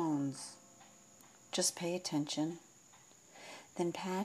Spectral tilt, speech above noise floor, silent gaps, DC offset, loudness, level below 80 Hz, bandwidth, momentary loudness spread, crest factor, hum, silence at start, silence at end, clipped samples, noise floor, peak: -3.5 dB/octave; 25 dB; none; under 0.1%; -38 LUFS; under -90 dBFS; 15.5 kHz; 25 LU; 20 dB; none; 0 s; 0 s; under 0.1%; -62 dBFS; -20 dBFS